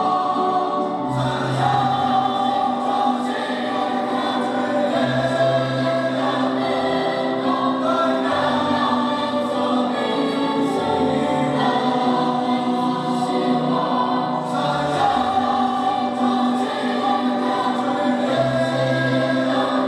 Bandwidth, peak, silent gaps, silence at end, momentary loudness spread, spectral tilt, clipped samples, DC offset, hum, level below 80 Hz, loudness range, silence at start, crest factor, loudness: 11.5 kHz; -6 dBFS; none; 0 s; 3 LU; -6 dB/octave; under 0.1%; under 0.1%; none; -58 dBFS; 1 LU; 0 s; 14 dB; -20 LUFS